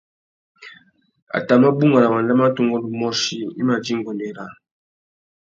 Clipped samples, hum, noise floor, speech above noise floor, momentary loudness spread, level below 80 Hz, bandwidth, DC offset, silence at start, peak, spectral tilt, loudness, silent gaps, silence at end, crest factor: under 0.1%; none; -52 dBFS; 34 dB; 14 LU; -66 dBFS; 7.6 kHz; under 0.1%; 0.6 s; -2 dBFS; -5.5 dB/octave; -18 LUFS; 1.22-1.27 s; 0.95 s; 18 dB